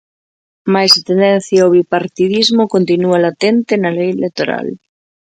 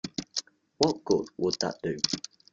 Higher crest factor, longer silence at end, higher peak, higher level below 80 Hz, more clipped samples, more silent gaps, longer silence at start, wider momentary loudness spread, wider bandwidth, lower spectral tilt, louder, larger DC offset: second, 14 dB vs 24 dB; first, 0.65 s vs 0.35 s; first, 0 dBFS vs -6 dBFS; about the same, -60 dBFS vs -64 dBFS; neither; neither; first, 0.65 s vs 0.05 s; about the same, 9 LU vs 8 LU; first, 16 kHz vs 9.4 kHz; first, -5 dB/octave vs -3.5 dB/octave; first, -12 LUFS vs -29 LUFS; neither